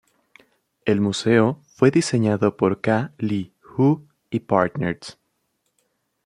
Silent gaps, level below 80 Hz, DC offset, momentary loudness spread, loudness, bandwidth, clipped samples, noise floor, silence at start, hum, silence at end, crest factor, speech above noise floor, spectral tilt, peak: none; -62 dBFS; under 0.1%; 11 LU; -21 LUFS; 11.5 kHz; under 0.1%; -72 dBFS; 0.85 s; none; 1.15 s; 20 dB; 52 dB; -6.5 dB/octave; -2 dBFS